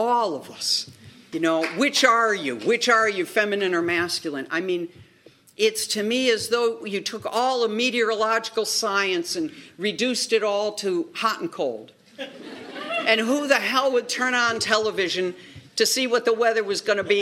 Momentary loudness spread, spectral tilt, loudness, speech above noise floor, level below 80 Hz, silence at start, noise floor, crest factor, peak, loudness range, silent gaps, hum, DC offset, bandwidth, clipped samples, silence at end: 10 LU; -2.5 dB/octave; -22 LUFS; 31 dB; -72 dBFS; 0 s; -54 dBFS; 20 dB; -2 dBFS; 4 LU; none; none; under 0.1%; 16 kHz; under 0.1%; 0 s